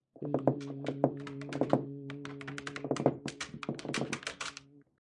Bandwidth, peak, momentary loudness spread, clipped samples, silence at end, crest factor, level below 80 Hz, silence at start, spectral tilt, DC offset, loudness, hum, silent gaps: 11.5 kHz; -10 dBFS; 10 LU; under 0.1%; 0.2 s; 26 dB; -72 dBFS; 0.15 s; -5.5 dB/octave; under 0.1%; -36 LUFS; none; none